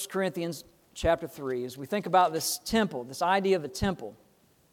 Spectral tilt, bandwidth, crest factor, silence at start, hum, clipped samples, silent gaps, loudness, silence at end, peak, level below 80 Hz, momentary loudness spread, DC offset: -4 dB/octave; 18 kHz; 20 dB; 0 s; none; under 0.1%; none; -29 LUFS; 0.6 s; -10 dBFS; -52 dBFS; 12 LU; under 0.1%